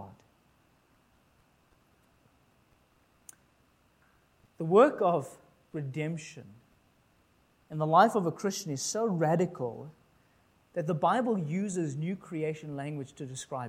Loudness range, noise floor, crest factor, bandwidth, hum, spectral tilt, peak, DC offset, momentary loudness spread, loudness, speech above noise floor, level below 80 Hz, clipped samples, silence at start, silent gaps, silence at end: 3 LU; -67 dBFS; 24 dB; 16.5 kHz; none; -5.5 dB/octave; -8 dBFS; under 0.1%; 19 LU; -30 LUFS; 38 dB; -74 dBFS; under 0.1%; 0 s; none; 0 s